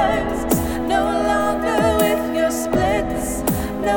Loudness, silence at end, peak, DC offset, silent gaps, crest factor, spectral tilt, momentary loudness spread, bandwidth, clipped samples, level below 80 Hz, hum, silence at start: -19 LUFS; 0 s; -4 dBFS; under 0.1%; none; 16 dB; -5 dB/octave; 4 LU; over 20 kHz; under 0.1%; -34 dBFS; none; 0 s